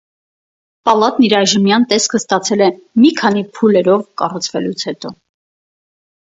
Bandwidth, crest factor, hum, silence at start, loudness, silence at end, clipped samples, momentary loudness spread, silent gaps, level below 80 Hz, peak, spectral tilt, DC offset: 8 kHz; 14 dB; none; 0.85 s; -14 LUFS; 1.1 s; under 0.1%; 9 LU; none; -60 dBFS; 0 dBFS; -4 dB/octave; under 0.1%